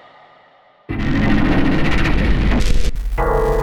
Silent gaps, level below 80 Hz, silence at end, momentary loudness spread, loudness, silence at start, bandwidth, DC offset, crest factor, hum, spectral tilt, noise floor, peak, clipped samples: none; -20 dBFS; 0 s; 7 LU; -18 LUFS; 0 s; 11.5 kHz; under 0.1%; 12 dB; none; -6.5 dB/octave; -50 dBFS; -4 dBFS; under 0.1%